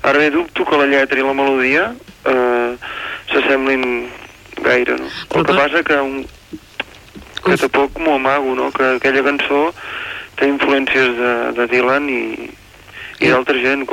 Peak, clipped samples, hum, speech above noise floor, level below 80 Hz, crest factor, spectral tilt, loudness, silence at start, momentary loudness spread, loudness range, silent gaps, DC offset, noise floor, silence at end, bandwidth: -2 dBFS; under 0.1%; none; 23 dB; -48 dBFS; 14 dB; -5 dB/octave; -15 LUFS; 0 s; 15 LU; 2 LU; none; under 0.1%; -38 dBFS; 0 s; 16 kHz